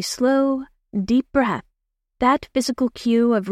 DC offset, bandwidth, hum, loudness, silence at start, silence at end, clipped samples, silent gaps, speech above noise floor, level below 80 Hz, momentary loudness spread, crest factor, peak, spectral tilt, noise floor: under 0.1%; 15 kHz; none; -21 LUFS; 0 s; 0 s; under 0.1%; none; 57 dB; -50 dBFS; 10 LU; 16 dB; -4 dBFS; -5 dB/octave; -76 dBFS